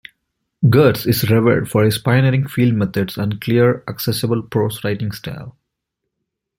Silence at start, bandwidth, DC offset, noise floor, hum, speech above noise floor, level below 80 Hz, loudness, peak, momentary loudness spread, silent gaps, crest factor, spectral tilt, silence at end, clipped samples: 0.6 s; 16.5 kHz; under 0.1%; -78 dBFS; none; 62 dB; -50 dBFS; -17 LUFS; -2 dBFS; 9 LU; none; 16 dB; -6.5 dB/octave; 1.1 s; under 0.1%